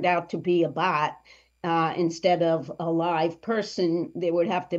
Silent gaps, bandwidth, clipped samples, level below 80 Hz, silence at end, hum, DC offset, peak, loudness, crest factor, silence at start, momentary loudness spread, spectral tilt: none; 7.8 kHz; under 0.1%; -68 dBFS; 0 s; none; under 0.1%; -10 dBFS; -26 LUFS; 16 dB; 0 s; 5 LU; -6 dB/octave